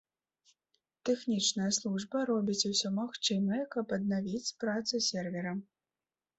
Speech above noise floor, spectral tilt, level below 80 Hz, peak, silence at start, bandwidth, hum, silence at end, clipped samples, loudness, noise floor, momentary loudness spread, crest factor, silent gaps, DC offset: over 57 dB; -3.5 dB/octave; -74 dBFS; -16 dBFS; 1.05 s; 8.2 kHz; none; 0.75 s; under 0.1%; -33 LUFS; under -90 dBFS; 7 LU; 18 dB; none; under 0.1%